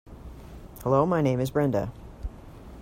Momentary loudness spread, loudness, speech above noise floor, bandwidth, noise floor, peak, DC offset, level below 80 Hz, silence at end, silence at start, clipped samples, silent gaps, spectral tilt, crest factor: 23 LU; -26 LUFS; 20 dB; 16 kHz; -44 dBFS; -8 dBFS; under 0.1%; -44 dBFS; 0 s; 0.05 s; under 0.1%; none; -8 dB/octave; 20 dB